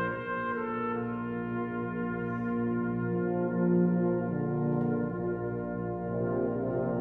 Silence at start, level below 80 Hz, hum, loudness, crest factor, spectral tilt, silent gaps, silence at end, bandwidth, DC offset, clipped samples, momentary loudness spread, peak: 0 s; -56 dBFS; 60 Hz at -55 dBFS; -31 LUFS; 14 dB; -11.5 dB/octave; none; 0 s; 3.9 kHz; under 0.1%; under 0.1%; 7 LU; -16 dBFS